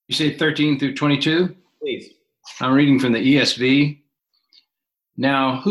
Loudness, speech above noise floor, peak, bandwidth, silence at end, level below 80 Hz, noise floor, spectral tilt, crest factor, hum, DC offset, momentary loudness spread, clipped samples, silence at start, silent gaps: -18 LUFS; 63 dB; -4 dBFS; 12 kHz; 0 s; -62 dBFS; -81 dBFS; -5.5 dB/octave; 16 dB; none; under 0.1%; 13 LU; under 0.1%; 0.1 s; none